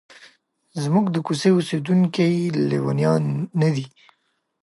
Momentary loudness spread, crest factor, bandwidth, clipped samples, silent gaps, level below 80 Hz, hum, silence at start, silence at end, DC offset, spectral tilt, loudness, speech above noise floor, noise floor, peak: 8 LU; 16 dB; 11.5 kHz; under 0.1%; none; -68 dBFS; none; 0.2 s; 0.75 s; under 0.1%; -7 dB/octave; -21 LUFS; 50 dB; -70 dBFS; -6 dBFS